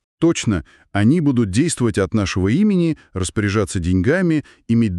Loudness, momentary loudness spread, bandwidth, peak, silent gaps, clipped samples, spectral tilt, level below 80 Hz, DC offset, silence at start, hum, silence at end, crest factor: -18 LUFS; 7 LU; 12 kHz; -4 dBFS; none; under 0.1%; -6 dB/octave; -40 dBFS; under 0.1%; 0.2 s; none; 0 s; 14 dB